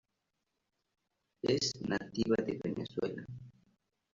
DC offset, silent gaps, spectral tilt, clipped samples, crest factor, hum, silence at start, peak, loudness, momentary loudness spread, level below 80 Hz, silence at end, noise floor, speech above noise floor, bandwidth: under 0.1%; none; -4.5 dB/octave; under 0.1%; 20 dB; none; 1.45 s; -18 dBFS; -35 LUFS; 13 LU; -66 dBFS; 0.65 s; -85 dBFS; 50 dB; 7.6 kHz